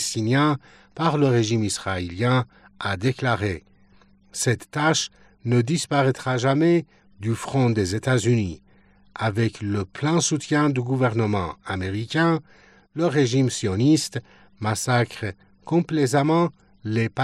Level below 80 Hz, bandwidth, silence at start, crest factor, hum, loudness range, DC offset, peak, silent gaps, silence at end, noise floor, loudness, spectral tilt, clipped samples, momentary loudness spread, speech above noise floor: -58 dBFS; 14 kHz; 0 s; 16 dB; none; 2 LU; under 0.1%; -6 dBFS; none; 0 s; -56 dBFS; -23 LUFS; -5.5 dB/octave; under 0.1%; 12 LU; 34 dB